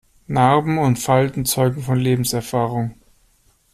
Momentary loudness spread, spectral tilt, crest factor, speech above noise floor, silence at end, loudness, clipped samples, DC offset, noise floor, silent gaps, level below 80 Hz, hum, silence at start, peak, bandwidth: 7 LU; -5.5 dB/octave; 16 dB; 40 dB; 0.8 s; -19 LUFS; under 0.1%; under 0.1%; -58 dBFS; none; -48 dBFS; none; 0.3 s; -4 dBFS; 15 kHz